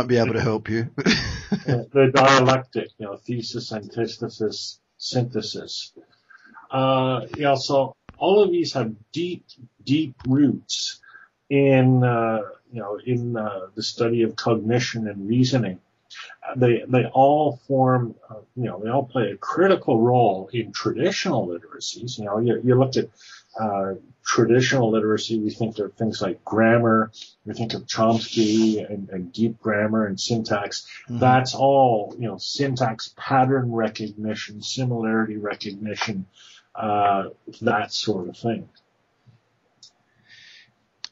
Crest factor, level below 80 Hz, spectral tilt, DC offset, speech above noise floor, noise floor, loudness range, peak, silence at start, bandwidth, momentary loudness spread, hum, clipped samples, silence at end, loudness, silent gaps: 20 dB; -56 dBFS; -5.5 dB/octave; under 0.1%; 41 dB; -63 dBFS; 5 LU; -2 dBFS; 0 s; 7.8 kHz; 14 LU; none; under 0.1%; 2.45 s; -22 LUFS; none